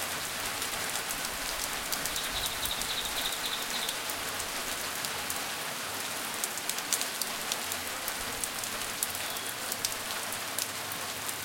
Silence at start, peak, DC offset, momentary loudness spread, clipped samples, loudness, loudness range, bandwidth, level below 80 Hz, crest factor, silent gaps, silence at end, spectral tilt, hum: 0 s; -4 dBFS; under 0.1%; 3 LU; under 0.1%; -32 LUFS; 1 LU; 17 kHz; -56 dBFS; 30 dB; none; 0 s; 0 dB/octave; none